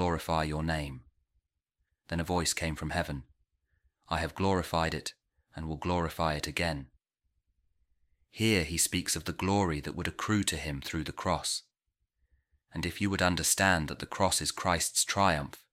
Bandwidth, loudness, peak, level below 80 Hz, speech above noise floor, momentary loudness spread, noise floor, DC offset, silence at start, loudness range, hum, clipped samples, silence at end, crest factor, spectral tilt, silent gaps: 16 kHz; -31 LUFS; -10 dBFS; -48 dBFS; 52 dB; 11 LU; -83 dBFS; under 0.1%; 0 s; 6 LU; none; under 0.1%; 0.15 s; 22 dB; -3.5 dB/octave; none